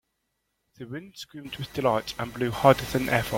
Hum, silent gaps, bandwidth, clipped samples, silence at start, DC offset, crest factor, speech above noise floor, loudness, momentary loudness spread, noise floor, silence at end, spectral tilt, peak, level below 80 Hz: none; none; 16.5 kHz; under 0.1%; 0.8 s; under 0.1%; 24 dB; 52 dB; -25 LUFS; 19 LU; -78 dBFS; 0 s; -5.5 dB/octave; -4 dBFS; -52 dBFS